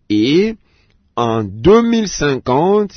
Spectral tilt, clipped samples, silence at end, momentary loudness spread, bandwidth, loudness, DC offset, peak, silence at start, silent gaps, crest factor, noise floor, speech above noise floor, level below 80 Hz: -5.5 dB/octave; under 0.1%; 0.1 s; 9 LU; 6.6 kHz; -14 LUFS; under 0.1%; -2 dBFS; 0.1 s; none; 12 dB; -55 dBFS; 42 dB; -38 dBFS